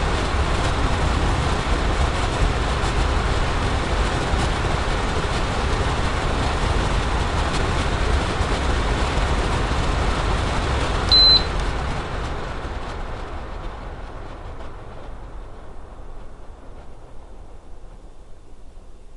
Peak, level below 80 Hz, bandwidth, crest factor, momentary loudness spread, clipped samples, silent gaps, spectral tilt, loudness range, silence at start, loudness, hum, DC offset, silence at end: -4 dBFS; -26 dBFS; 11.5 kHz; 18 dB; 16 LU; under 0.1%; none; -4.5 dB/octave; 20 LU; 0 s; -21 LUFS; none; under 0.1%; 0 s